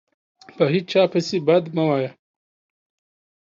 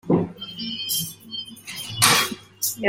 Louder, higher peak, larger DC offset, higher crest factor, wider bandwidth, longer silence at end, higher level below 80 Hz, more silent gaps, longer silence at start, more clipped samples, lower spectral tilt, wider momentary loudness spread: about the same, -20 LUFS vs -22 LUFS; second, -4 dBFS vs 0 dBFS; neither; second, 18 dB vs 24 dB; second, 7.6 kHz vs 16.5 kHz; first, 1.3 s vs 0 s; second, -70 dBFS vs -58 dBFS; neither; first, 0.55 s vs 0.05 s; neither; first, -6.5 dB/octave vs -2.5 dB/octave; second, 5 LU vs 17 LU